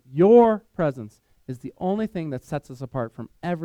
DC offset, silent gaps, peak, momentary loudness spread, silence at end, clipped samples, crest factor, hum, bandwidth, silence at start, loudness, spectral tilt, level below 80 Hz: under 0.1%; none; -4 dBFS; 21 LU; 0 s; under 0.1%; 18 dB; none; 9 kHz; 0.1 s; -22 LUFS; -9 dB/octave; -56 dBFS